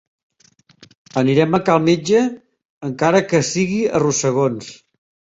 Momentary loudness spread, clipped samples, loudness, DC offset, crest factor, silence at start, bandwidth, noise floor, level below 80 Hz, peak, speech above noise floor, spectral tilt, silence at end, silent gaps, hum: 12 LU; under 0.1%; -17 LUFS; under 0.1%; 16 dB; 1.15 s; 8.2 kHz; -55 dBFS; -56 dBFS; -2 dBFS; 39 dB; -5 dB/octave; 0.65 s; 2.65-2.81 s; none